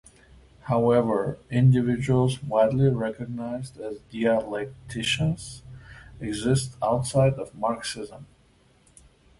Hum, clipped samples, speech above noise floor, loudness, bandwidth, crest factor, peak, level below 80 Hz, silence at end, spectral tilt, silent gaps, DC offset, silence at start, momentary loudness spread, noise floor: none; under 0.1%; 35 dB; -25 LUFS; 11.5 kHz; 18 dB; -8 dBFS; -52 dBFS; 1.15 s; -6.5 dB/octave; none; under 0.1%; 0.65 s; 16 LU; -60 dBFS